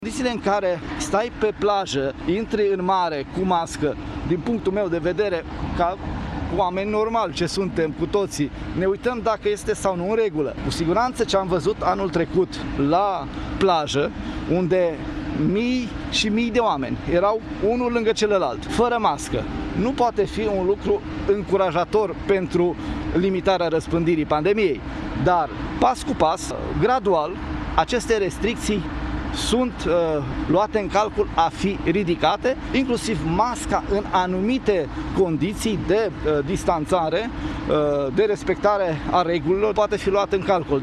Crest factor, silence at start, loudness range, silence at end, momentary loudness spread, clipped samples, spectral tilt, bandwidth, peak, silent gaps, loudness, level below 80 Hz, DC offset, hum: 18 dB; 0 s; 2 LU; 0 s; 5 LU; under 0.1%; -5.5 dB/octave; 13 kHz; -2 dBFS; none; -22 LUFS; -38 dBFS; under 0.1%; none